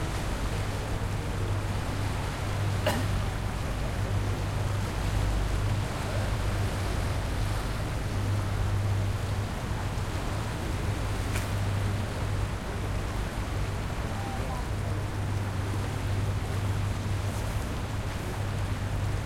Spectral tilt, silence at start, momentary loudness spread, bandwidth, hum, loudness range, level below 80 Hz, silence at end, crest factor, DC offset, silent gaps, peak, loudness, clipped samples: -5.5 dB/octave; 0 s; 3 LU; 16 kHz; none; 2 LU; -36 dBFS; 0 s; 16 dB; under 0.1%; none; -14 dBFS; -31 LUFS; under 0.1%